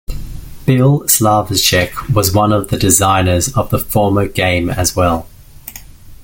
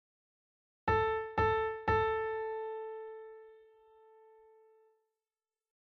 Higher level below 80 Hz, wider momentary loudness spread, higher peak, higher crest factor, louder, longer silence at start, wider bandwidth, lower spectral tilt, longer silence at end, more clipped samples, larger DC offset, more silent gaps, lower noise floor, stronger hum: first, -32 dBFS vs -54 dBFS; about the same, 19 LU vs 17 LU; first, 0 dBFS vs -18 dBFS; about the same, 14 dB vs 18 dB; first, -13 LUFS vs -34 LUFS; second, 0.1 s vs 0.85 s; first, 17 kHz vs 6.2 kHz; second, -4 dB/octave vs -7 dB/octave; second, 0 s vs 2.4 s; neither; neither; neither; second, -34 dBFS vs under -90 dBFS; neither